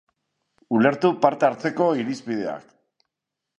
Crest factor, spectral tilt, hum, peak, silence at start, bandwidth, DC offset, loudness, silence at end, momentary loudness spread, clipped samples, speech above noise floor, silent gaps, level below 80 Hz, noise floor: 22 dB; -6.5 dB/octave; none; -2 dBFS; 0.7 s; 9.6 kHz; under 0.1%; -22 LUFS; 1 s; 9 LU; under 0.1%; 63 dB; none; -70 dBFS; -84 dBFS